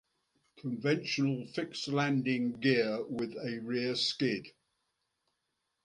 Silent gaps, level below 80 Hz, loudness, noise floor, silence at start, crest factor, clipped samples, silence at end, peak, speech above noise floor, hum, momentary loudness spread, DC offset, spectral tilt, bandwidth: none; -76 dBFS; -33 LUFS; -83 dBFS; 0.55 s; 20 dB; under 0.1%; 1.35 s; -14 dBFS; 50 dB; none; 9 LU; under 0.1%; -5.5 dB/octave; 11 kHz